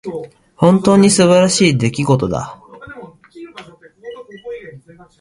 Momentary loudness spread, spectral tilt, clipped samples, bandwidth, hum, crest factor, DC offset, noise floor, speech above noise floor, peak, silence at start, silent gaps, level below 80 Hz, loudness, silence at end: 24 LU; -5 dB/octave; under 0.1%; 11.5 kHz; none; 16 dB; under 0.1%; -41 dBFS; 29 dB; 0 dBFS; 0.05 s; none; -48 dBFS; -12 LUFS; 0.4 s